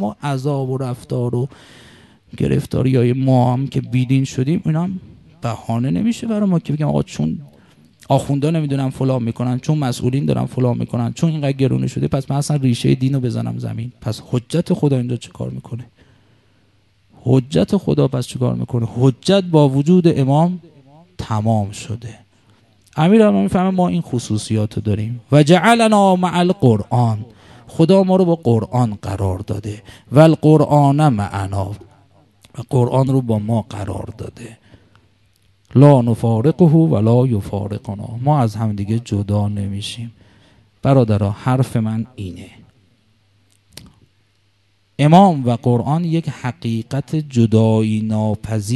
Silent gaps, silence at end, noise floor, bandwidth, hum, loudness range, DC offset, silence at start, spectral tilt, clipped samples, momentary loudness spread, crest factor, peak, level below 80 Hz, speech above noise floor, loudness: none; 0 s; -61 dBFS; 12.5 kHz; none; 6 LU; under 0.1%; 0 s; -7.5 dB/octave; under 0.1%; 15 LU; 16 dB; 0 dBFS; -44 dBFS; 45 dB; -17 LUFS